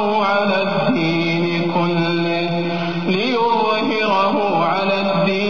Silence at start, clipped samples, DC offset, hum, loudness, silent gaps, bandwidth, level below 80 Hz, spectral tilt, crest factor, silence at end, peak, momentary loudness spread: 0 s; under 0.1%; 1%; none; -18 LUFS; none; 5.4 kHz; -66 dBFS; -7 dB/octave; 12 dB; 0 s; -6 dBFS; 3 LU